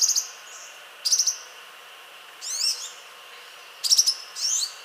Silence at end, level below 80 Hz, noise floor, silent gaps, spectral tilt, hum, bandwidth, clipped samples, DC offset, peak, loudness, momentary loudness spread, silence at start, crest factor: 0 s; under -90 dBFS; -45 dBFS; none; 6 dB/octave; none; 16 kHz; under 0.1%; under 0.1%; -6 dBFS; -22 LUFS; 24 LU; 0 s; 22 dB